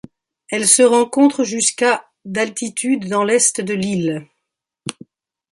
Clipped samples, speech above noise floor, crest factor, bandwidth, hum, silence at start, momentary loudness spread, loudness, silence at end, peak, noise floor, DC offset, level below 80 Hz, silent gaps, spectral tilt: under 0.1%; 62 dB; 18 dB; 12.5 kHz; none; 0.5 s; 17 LU; -16 LUFS; 0.6 s; 0 dBFS; -79 dBFS; under 0.1%; -62 dBFS; none; -3 dB/octave